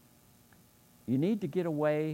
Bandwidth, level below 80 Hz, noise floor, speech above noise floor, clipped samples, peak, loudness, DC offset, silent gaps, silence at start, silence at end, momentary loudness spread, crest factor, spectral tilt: 16 kHz; -74 dBFS; -62 dBFS; 32 dB; under 0.1%; -18 dBFS; -32 LUFS; under 0.1%; none; 1.05 s; 0 s; 4 LU; 16 dB; -8.5 dB/octave